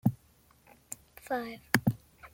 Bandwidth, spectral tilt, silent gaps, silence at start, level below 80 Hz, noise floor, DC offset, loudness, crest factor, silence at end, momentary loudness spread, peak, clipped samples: 17 kHz; -5.5 dB/octave; none; 0.05 s; -62 dBFS; -64 dBFS; under 0.1%; -32 LUFS; 30 dB; 0.05 s; 17 LU; -4 dBFS; under 0.1%